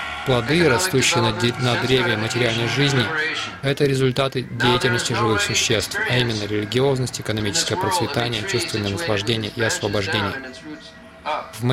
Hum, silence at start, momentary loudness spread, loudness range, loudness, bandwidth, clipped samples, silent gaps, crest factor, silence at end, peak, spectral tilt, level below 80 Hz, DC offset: none; 0 s; 7 LU; 4 LU; -20 LUFS; 16 kHz; under 0.1%; none; 18 dB; 0 s; -4 dBFS; -4 dB/octave; -48 dBFS; under 0.1%